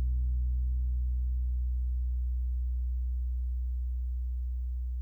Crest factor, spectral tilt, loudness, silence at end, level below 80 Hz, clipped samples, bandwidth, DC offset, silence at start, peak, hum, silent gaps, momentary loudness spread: 6 dB; -10 dB/octave; -34 LUFS; 0 s; -30 dBFS; under 0.1%; 0.4 kHz; under 0.1%; 0 s; -24 dBFS; none; none; 4 LU